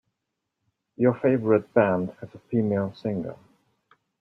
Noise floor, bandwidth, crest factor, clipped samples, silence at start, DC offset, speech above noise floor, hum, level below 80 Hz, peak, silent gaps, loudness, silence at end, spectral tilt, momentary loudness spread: -82 dBFS; 5.8 kHz; 20 dB; under 0.1%; 1 s; under 0.1%; 58 dB; none; -66 dBFS; -6 dBFS; none; -25 LUFS; 0.85 s; -10.5 dB/octave; 12 LU